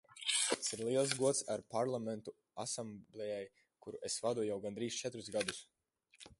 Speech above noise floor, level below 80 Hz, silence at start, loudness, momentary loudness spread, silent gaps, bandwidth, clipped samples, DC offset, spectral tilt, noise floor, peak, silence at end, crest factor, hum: 26 dB; -78 dBFS; 0.1 s; -38 LUFS; 16 LU; none; 11.5 kHz; under 0.1%; under 0.1%; -2.5 dB/octave; -66 dBFS; -14 dBFS; 0.05 s; 26 dB; none